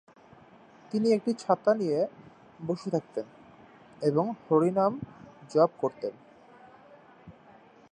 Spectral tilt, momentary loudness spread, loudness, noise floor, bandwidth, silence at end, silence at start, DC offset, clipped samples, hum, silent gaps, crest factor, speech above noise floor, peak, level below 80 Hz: -7.5 dB/octave; 13 LU; -28 LUFS; -55 dBFS; 10 kHz; 0.6 s; 0.95 s; under 0.1%; under 0.1%; none; none; 20 dB; 28 dB; -10 dBFS; -72 dBFS